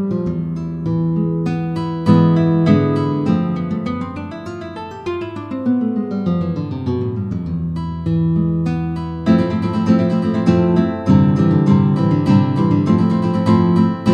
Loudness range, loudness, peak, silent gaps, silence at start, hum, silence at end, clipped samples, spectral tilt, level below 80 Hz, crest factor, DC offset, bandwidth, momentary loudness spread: 7 LU; -17 LUFS; 0 dBFS; none; 0 s; none; 0 s; under 0.1%; -9.5 dB/octave; -42 dBFS; 16 dB; under 0.1%; 7 kHz; 11 LU